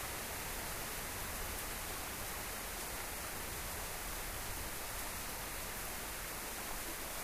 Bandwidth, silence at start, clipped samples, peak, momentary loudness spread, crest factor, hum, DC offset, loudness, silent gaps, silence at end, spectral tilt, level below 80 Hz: 15.5 kHz; 0 s; under 0.1%; -26 dBFS; 1 LU; 18 dB; none; under 0.1%; -41 LUFS; none; 0 s; -2 dB/octave; -52 dBFS